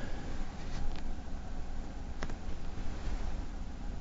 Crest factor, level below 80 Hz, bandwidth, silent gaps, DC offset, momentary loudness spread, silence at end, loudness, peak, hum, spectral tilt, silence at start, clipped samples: 14 dB; -36 dBFS; 7.6 kHz; none; under 0.1%; 4 LU; 0 s; -44 LUFS; -20 dBFS; 60 Hz at -50 dBFS; -5.5 dB/octave; 0 s; under 0.1%